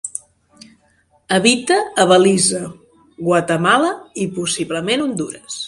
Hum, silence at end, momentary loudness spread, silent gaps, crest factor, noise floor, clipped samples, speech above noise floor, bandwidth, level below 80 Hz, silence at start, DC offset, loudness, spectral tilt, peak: none; 0 s; 14 LU; none; 18 dB; -58 dBFS; under 0.1%; 42 dB; 11.5 kHz; -58 dBFS; 0.05 s; under 0.1%; -16 LUFS; -3.5 dB/octave; 0 dBFS